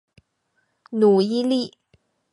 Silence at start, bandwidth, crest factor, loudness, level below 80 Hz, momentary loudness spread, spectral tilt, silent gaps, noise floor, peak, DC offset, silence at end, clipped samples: 0.9 s; 11 kHz; 16 dB; -20 LUFS; -72 dBFS; 14 LU; -7 dB/octave; none; -71 dBFS; -6 dBFS; under 0.1%; 0.65 s; under 0.1%